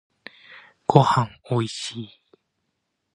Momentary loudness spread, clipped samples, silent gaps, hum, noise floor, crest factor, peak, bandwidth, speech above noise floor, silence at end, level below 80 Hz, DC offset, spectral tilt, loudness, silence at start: 22 LU; under 0.1%; none; none; -77 dBFS; 24 dB; 0 dBFS; 10.5 kHz; 55 dB; 1.1 s; -60 dBFS; under 0.1%; -6 dB/octave; -22 LUFS; 0.5 s